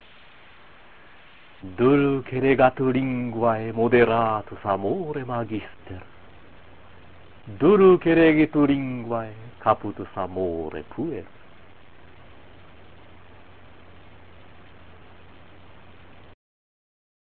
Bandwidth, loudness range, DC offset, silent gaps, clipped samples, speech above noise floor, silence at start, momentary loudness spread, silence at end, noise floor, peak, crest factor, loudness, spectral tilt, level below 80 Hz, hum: 4.4 kHz; 13 LU; 0.6%; none; under 0.1%; 30 dB; 0 s; 18 LU; 6.05 s; -51 dBFS; -4 dBFS; 20 dB; -22 LUFS; -11 dB/octave; -52 dBFS; none